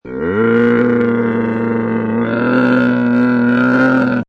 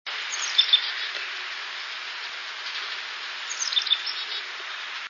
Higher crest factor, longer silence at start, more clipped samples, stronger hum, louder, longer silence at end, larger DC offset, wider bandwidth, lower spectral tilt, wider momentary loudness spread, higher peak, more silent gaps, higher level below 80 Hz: second, 10 dB vs 22 dB; about the same, 0.05 s vs 0.05 s; neither; neither; first, -14 LUFS vs -26 LUFS; about the same, 0.05 s vs 0 s; neither; second, 5.6 kHz vs 7.4 kHz; first, -9 dB/octave vs 4.5 dB/octave; second, 5 LU vs 12 LU; first, -2 dBFS vs -6 dBFS; neither; first, -48 dBFS vs under -90 dBFS